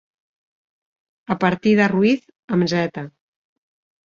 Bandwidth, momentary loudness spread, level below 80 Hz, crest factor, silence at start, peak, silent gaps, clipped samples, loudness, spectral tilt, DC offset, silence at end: 7.4 kHz; 11 LU; -60 dBFS; 20 dB; 1.3 s; -2 dBFS; 2.39-2.48 s; under 0.1%; -19 LUFS; -6.5 dB/octave; under 0.1%; 0.95 s